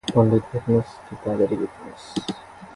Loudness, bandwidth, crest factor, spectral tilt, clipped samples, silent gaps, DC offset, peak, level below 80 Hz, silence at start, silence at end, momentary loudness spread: -24 LUFS; 11.5 kHz; 20 dB; -7.5 dB/octave; under 0.1%; none; under 0.1%; -4 dBFS; -50 dBFS; 0.05 s; 0 s; 16 LU